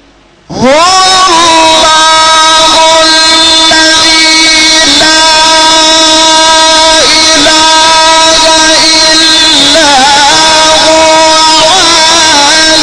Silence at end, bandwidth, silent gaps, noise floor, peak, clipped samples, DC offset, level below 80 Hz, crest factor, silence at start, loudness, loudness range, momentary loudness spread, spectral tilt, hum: 0 s; over 20 kHz; none; -38 dBFS; 0 dBFS; 4%; under 0.1%; -32 dBFS; 4 dB; 0.5 s; -1 LUFS; 1 LU; 1 LU; -0.5 dB/octave; none